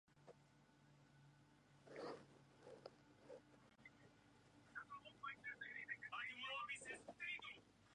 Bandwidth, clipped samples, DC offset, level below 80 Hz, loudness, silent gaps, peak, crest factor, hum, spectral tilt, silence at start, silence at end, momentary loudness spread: 10.5 kHz; under 0.1%; under 0.1%; -86 dBFS; -53 LUFS; none; -38 dBFS; 20 dB; none; -2.5 dB/octave; 0.1 s; 0 s; 18 LU